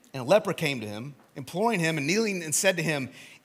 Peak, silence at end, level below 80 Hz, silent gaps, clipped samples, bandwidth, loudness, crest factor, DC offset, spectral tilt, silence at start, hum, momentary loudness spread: -8 dBFS; 0.05 s; -76 dBFS; none; under 0.1%; 16.5 kHz; -26 LUFS; 20 dB; under 0.1%; -4 dB/octave; 0.15 s; none; 15 LU